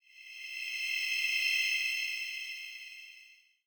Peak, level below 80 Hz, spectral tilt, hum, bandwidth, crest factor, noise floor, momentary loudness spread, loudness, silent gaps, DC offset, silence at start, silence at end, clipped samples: -20 dBFS; -90 dBFS; 5.5 dB/octave; none; over 20 kHz; 18 dB; -59 dBFS; 18 LU; -31 LUFS; none; under 0.1%; 0.15 s; 0.3 s; under 0.1%